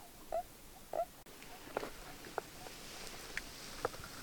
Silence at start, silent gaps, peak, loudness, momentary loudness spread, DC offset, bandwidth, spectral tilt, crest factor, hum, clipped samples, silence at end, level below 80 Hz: 0 s; none; -20 dBFS; -46 LUFS; 10 LU; under 0.1%; 19.5 kHz; -3 dB/octave; 26 dB; none; under 0.1%; 0 s; -60 dBFS